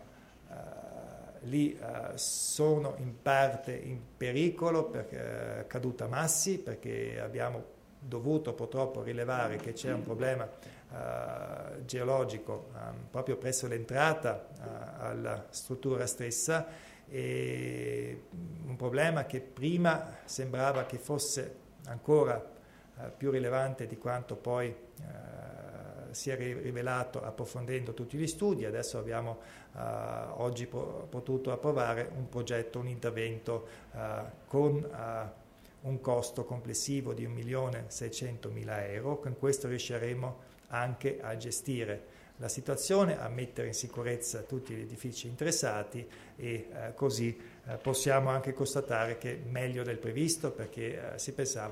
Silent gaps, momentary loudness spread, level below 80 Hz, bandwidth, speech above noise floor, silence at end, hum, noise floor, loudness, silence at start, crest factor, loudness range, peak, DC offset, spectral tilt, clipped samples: none; 14 LU; -64 dBFS; 16 kHz; 21 dB; 0 s; none; -55 dBFS; -35 LUFS; 0 s; 22 dB; 4 LU; -14 dBFS; under 0.1%; -4.5 dB/octave; under 0.1%